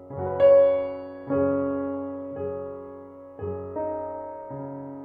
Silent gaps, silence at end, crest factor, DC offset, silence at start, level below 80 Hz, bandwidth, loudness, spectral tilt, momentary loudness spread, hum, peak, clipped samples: none; 0 s; 18 dB; under 0.1%; 0 s; -58 dBFS; 3.6 kHz; -25 LUFS; -10.5 dB/octave; 19 LU; none; -8 dBFS; under 0.1%